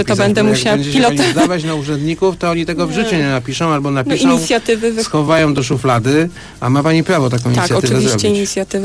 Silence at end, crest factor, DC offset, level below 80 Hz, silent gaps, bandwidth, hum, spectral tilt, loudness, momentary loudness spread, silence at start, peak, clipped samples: 0 s; 12 dB; under 0.1%; -42 dBFS; none; 11 kHz; none; -5 dB/octave; -14 LUFS; 5 LU; 0 s; -2 dBFS; under 0.1%